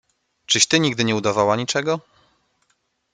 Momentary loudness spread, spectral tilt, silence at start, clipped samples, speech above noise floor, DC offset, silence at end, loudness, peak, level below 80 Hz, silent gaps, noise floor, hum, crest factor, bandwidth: 8 LU; -3 dB/octave; 0.5 s; under 0.1%; 49 dB; under 0.1%; 1.15 s; -19 LUFS; 0 dBFS; -60 dBFS; none; -69 dBFS; none; 22 dB; 11 kHz